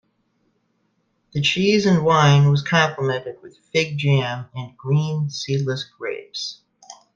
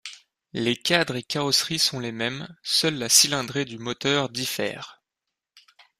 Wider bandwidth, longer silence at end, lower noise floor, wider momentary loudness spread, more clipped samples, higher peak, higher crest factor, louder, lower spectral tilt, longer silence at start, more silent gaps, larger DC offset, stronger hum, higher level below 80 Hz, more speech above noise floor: second, 7.6 kHz vs 15.5 kHz; second, 0.2 s vs 0.4 s; second, -68 dBFS vs -85 dBFS; about the same, 15 LU vs 15 LU; neither; about the same, -2 dBFS vs -2 dBFS; second, 18 dB vs 24 dB; first, -20 LUFS vs -23 LUFS; first, -5.5 dB/octave vs -2 dB/octave; first, 1.35 s vs 0.05 s; neither; neither; neither; first, -58 dBFS vs -64 dBFS; second, 49 dB vs 60 dB